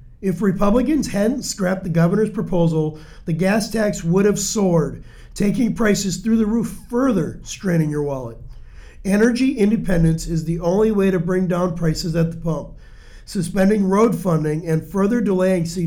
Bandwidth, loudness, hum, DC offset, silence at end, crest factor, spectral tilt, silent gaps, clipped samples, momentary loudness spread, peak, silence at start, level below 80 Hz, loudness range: 16.5 kHz; -19 LUFS; none; under 0.1%; 0 s; 14 dB; -6.5 dB/octave; none; under 0.1%; 9 LU; -6 dBFS; 0 s; -38 dBFS; 2 LU